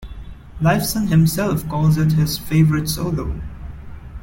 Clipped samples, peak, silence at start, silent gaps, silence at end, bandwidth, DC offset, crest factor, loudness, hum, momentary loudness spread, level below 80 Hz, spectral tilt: under 0.1%; -4 dBFS; 0 s; none; 0 s; 17 kHz; under 0.1%; 14 dB; -18 LUFS; none; 21 LU; -34 dBFS; -6 dB/octave